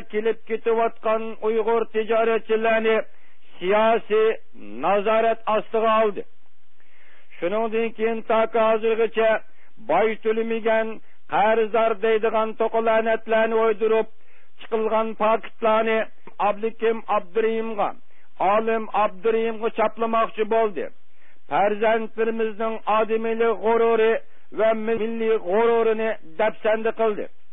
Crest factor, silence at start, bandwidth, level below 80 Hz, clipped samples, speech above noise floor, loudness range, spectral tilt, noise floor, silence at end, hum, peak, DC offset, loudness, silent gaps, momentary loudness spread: 14 dB; 0 s; 3.8 kHz; -66 dBFS; under 0.1%; 44 dB; 2 LU; -9.5 dB/octave; -65 dBFS; 0.25 s; none; -8 dBFS; 3%; -22 LUFS; none; 7 LU